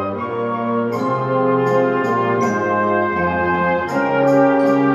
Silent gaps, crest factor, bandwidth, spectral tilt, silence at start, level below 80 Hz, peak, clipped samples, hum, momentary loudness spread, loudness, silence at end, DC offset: none; 14 dB; 12.5 kHz; -7.5 dB/octave; 0 s; -52 dBFS; -2 dBFS; under 0.1%; none; 6 LU; -17 LUFS; 0 s; under 0.1%